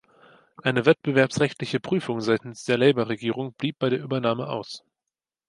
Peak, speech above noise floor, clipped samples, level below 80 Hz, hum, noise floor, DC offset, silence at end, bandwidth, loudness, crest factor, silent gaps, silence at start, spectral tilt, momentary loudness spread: -4 dBFS; 64 dB; under 0.1%; -66 dBFS; none; -88 dBFS; under 0.1%; 0.7 s; 11.5 kHz; -24 LUFS; 20 dB; none; 0.65 s; -6 dB/octave; 9 LU